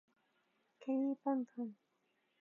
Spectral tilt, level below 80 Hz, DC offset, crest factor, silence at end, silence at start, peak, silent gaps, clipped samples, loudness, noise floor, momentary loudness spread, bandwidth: -6.5 dB/octave; under -90 dBFS; under 0.1%; 18 dB; 0.7 s; 0.8 s; -24 dBFS; none; under 0.1%; -40 LUFS; -81 dBFS; 11 LU; 3.6 kHz